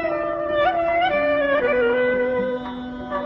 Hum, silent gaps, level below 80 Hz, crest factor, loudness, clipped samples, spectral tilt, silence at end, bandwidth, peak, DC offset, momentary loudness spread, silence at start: none; none; -48 dBFS; 12 dB; -21 LUFS; under 0.1%; -7 dB/octave; 0 s; 5.8 kHz; -8 dBFS; under 0.1%; 10 LU; 0 s